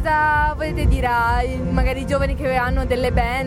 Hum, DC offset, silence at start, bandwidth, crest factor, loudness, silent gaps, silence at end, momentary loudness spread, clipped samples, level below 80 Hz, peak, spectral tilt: none; under 0.1%; 0 s; 13.5 kHz; 12 dB; -20 LUFS; none; 0 s; 4 LU; under 0.1%; -24 dBFS; -6 dBFS; -6.5 dB/octave